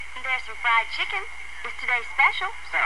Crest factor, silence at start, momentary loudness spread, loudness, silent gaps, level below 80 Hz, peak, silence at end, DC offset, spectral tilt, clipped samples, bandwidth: 18 dB; 0 s; 12 LU; -24 LUFS; none; -54 dBFS; -6 dBFS; 0 s; 2%; -1 dB/octave; under 0.1%; 12 kHz